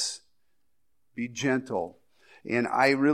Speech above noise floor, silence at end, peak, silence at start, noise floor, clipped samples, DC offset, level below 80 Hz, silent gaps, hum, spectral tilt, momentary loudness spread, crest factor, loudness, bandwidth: 55 dB; 0 s; -8 dBFS; 0 s; -81 dBFS; under 0.1%; under 0.1%; -72 dBFS; none; none; -4 dB/octave; 20 LU; 20 dB; -28 LUFS; 13 kHz